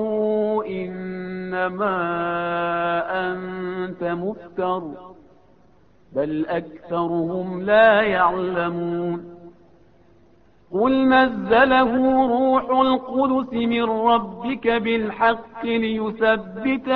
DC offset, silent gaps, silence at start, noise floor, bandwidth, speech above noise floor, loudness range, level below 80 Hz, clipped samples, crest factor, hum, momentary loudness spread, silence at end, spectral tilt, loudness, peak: 0.1%; none; 0 s; -56 dBFS; 5 kHz; 36 dB; 9 LU; -54 dBFS; under 0.1%; 18 dB; none; 12 LU; 0 s; -9 dB/octave; -21 LUFS; -4 dBFS